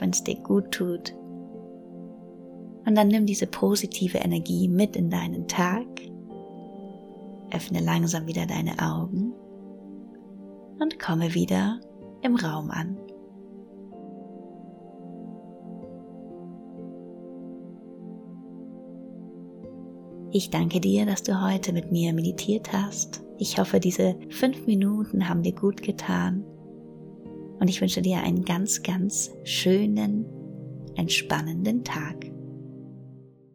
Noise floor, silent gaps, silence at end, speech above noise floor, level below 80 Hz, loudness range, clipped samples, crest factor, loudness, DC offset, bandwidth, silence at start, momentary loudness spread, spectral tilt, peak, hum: -48 dBFS; none; 0.3 s; 23 dB; -60 dBFS; 17 LU; under 0.1%; 22 dB; -26 LUFS; under 0.1%; 19 kHz; 0 s; 20 LU; -5 dB/octave; -6 dBFS; none